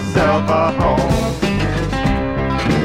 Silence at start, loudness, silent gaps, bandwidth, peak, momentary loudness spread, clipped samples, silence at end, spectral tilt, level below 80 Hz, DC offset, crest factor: 0 s; -17 LUFS; none; 16 kHz; -2 dBFS; 4 LU; under 0.1%; 0 s; -6.5 dB/octave; -26 dBFS; under 0.1%; 14 dB